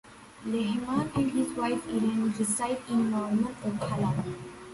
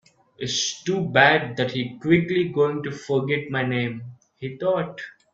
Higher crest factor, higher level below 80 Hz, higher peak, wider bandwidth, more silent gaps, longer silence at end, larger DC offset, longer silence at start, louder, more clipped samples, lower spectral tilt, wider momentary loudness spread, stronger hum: second, 14 dB vs 22 dB; about the same, -58 dBFS vs -60 dBFS; second, -14 dBFS vs -2 dBFS; first, 11.5 kHz vs 8 kHz; neither; second, 0 s vs 0.25 s; neither; second, 0.05 s vs 0.4 s; second, -29 LUFS vs -22 LUFS; neither; about the same, -5.5 dB/octave vs -4.5 dB/octave; second, 6 LU vs 17 LU; neither